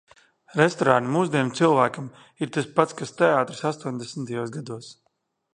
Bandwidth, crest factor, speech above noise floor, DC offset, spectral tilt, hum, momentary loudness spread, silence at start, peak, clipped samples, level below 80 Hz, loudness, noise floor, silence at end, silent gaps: 10 kHz; 24 dB; 49 dB; under 0.1%; -5.5 dB/octave; none; 14 LU; 0.55 s; -2 dBFS; under 0.1%; -70 dBFS; -23 LUFS; -73 dBFS; 0.6 s; none